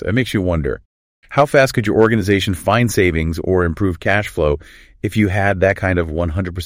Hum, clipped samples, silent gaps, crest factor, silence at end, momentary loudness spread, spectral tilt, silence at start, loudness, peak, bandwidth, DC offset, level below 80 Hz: none; under 0.1%; 0.85-1.22 s; 16 dB; 0 s; 7 LU; -6 dB/octave; 0 s; -17 LUFS; -2 dBFS; 16 kHz; under 0.1%; -32 dBFS